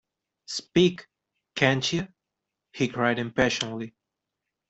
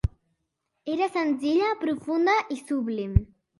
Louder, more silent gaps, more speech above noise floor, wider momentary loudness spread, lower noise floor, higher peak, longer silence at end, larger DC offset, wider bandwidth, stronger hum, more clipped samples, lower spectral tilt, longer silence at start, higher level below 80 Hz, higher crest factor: about the same, -25 LUFS vs -26 LUFS; neither; first, 60 dB vs 54 dB; first, 15 LU vs 8 LU; first, -85 dBFS vs -79 dBFS; about the same, -6 dBFS vs -4 dBFS; first, 0.8 s vs 0.35 s; neither; second, 8.2 kHz vs 11.5 kHz; neither; neither; second, -4.5 dB/octave vs -7 dB/octave; first, 0.5 s vs 0.05 s; second, -58 dBFS vs -36 dBFS; about the same, 24 dB vs 22 dB